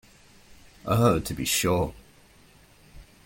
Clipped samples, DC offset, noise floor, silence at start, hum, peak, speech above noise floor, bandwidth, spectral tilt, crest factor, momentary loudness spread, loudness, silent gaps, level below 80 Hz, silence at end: under 0.1%; under 0.1%; -55 dBFS; 0.85 s; none; -8 dBFS; 32 dB; 17 kHz; -4.5 dB/octave; 20 dB; 9 LU; -25 LUFS; none; -48 dBFS; 0.25 s